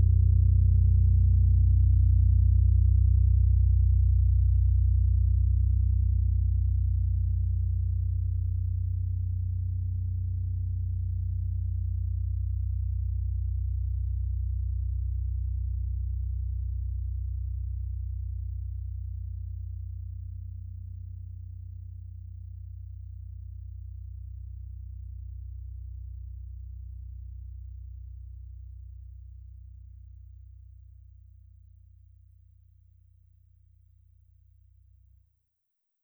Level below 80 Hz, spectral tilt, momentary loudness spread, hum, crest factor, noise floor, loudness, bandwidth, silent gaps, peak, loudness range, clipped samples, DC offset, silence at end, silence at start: -30 dBFS; -14 dB/octave; 21 LU; none; 14 dB; -80 dBFS; -28 LUFS; 0.5 kHz; none; -14 dBFS; 21 LU; under 0.1%; under 0.1%; 5.6 s; 0 s